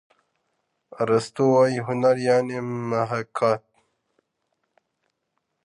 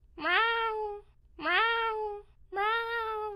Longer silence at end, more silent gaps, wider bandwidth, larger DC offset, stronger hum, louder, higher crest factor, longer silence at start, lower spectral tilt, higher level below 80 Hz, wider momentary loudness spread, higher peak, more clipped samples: first, 2.05 s vs 0 s; neither; second, 11 kHz vs 15 kHz; neither; neither; first, -23 LUFS vs -30 LUFS; about the same, 18 dB vs 20 dB; first, 1 s vs 0.15 s; first, -6.5 dB/octave vs -3.5 dB/octave; second, -68 dBFS vs -58 dBFS; second, 10 LU vs 14 LU; first, -6 dBFS vs -12 dBFS; neither